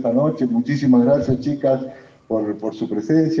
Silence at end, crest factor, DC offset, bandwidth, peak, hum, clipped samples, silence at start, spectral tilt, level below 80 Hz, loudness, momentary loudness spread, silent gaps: 0 s; 14 dB; under 0.1%; 7.2 kHz; -6 dBFS; none; under 0.1%; 0 s; -8.5 dB/octave; -54 dBFS; -19 LUFS; 10 LU; none